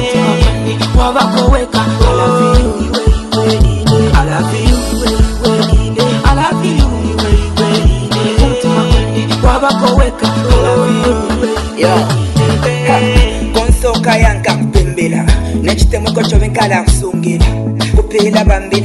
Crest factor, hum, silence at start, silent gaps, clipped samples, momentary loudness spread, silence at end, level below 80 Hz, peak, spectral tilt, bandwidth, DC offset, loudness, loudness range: 10 dB; none; 0 s; none; 0.2%; 4 LU; 0 s; -14 dBFS; 0 dBFS; -5.5 dB/octave; 12.5 kHz; under 0.1%; -11 LUFS; 1 LU